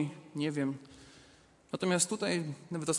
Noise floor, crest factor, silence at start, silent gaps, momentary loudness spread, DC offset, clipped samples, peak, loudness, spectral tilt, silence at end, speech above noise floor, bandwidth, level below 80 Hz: -61 dBFS; 22 dB; 0 s; none; 16 LU; under 0.1%; under 0.1%; -14 dBFS; -34 LUFS; -4 dB/octave; 0 s; 28 dB; 11.5 kHz; -72 dBFS